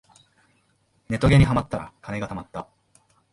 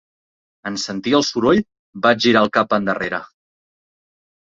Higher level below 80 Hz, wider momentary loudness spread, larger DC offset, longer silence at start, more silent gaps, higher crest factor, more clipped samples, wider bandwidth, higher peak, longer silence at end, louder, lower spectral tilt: first, -38 dBFS vs -56 dBFS; first, 18 LU vs 13 LU; neither; first, 1.1 s vs 0.65 s; second, none vs 1.79-1.93 s; about the same, 18 dB vs 18 dB; neither; first, 11.5 kHz vs 7.8 kHz; second, -6 dBFS vs -2 dBFS; second, 0.7 s vs 1.25 s; second, -23 LUFS vs -18 LUFS; first, -7.5 dB/octave vs -4.5 dB/octave